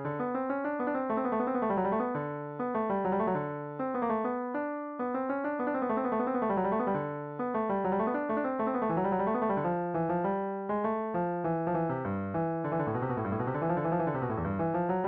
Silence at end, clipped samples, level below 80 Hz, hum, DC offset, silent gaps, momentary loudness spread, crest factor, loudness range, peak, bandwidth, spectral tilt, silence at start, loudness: 0 s; under 0.1%; -62 dBFS; none; under 0.1%; none; 4 LU; 12 dB; 2 LU; -18 dBFS; 4.7 kHz; -8 dB/octave; 0 s; -31 LUFS